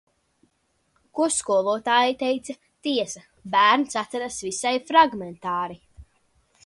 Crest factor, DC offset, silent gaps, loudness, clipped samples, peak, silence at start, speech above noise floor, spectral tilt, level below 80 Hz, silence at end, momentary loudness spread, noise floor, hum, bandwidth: 22 dB; under 0.1%; none; -23 LUFS; under 0.1%; -4 dBFS; 1.15 s; 47 dB; -2.5 dB/octave; -60 dBFS; 0.65 s; 14 LU; -70 dBFS; none; 11.5 kHz